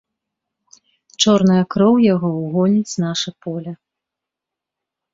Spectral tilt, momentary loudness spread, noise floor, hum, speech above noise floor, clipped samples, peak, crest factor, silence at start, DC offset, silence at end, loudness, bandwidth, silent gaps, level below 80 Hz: -5.5 dB/octave; 14 LU; -85 dBFS; none; 69 dB; under 0.1%; -2 dBFS; 18 dB; 1.2 s; under 0.1%; 1.4 s; -16 LUFS; 7.8 kHz; none; -58 dBFS